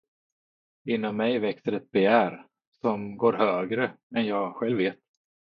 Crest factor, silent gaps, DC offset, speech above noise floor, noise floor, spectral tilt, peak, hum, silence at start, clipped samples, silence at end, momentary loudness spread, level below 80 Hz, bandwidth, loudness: 22 dB; 2.67-2.72 s, 4.03-4.10 s; under 0.1%; over 64 dB; under -90 dBFS; -8.5 dB/octave; -6 dBFS; none; 0.85 s; under 0.1%; 0.5 s; 9 LU; -72 dBFS; 5.2 kHz; -26 LUFS